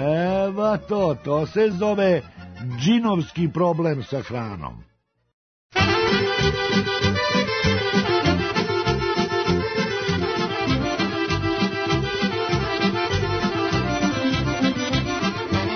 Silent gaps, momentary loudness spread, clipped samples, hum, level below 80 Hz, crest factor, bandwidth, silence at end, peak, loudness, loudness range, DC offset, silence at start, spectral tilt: 5.33-5.70 s; 5 LU; under 0.1%; none; -42 dBFS; 16 dB; 6.6 kHz; 0 s; -6 dBFS; -22 LUFS; 3 LU; under 0.1%; 0 s; -5.5 dB/octave